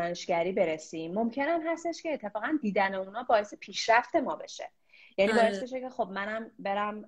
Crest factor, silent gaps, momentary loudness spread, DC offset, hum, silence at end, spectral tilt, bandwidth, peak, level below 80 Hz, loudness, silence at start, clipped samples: 20 dB; none; 11 LU; under 0.1%; none; 0 s; -4.5 dB/octave; 11 kHz; -10 dBFS; -68 dBFS; -30 LUFS; 0 s; under 0.1%